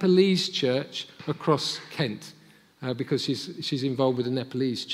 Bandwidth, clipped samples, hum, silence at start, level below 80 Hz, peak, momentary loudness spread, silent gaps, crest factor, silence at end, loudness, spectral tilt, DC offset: 15 kHz; under 0.1%; none; 0 s; -74 dBFS; -8 dBFS; 11 LU; none; 18 dB; 0 s; -27 LUFS; -5.5 dB/octave; under 0.1%